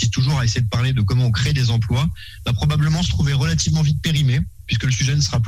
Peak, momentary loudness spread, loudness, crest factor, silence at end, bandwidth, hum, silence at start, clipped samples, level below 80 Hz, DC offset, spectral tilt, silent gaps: -6 dBFS; 4 LU; -19 LUFS; 12 dB; 0 s; 14 kHz; none; 0 s; under 0.1%; -32 dBFS; under 0.1%; -5 dB/octave; none